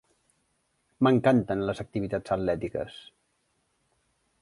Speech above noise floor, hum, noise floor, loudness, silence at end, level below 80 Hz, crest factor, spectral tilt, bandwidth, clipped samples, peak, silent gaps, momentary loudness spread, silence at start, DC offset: 47 dB; none; -73 dBFS; -27 LUFS; 1.45 s; -56 dBFS; 20 dB; -8 dB/octave; 11.5 kHz; under 0.1%; -8 dBFS; none; 13 LU; 1 s; under 0.1%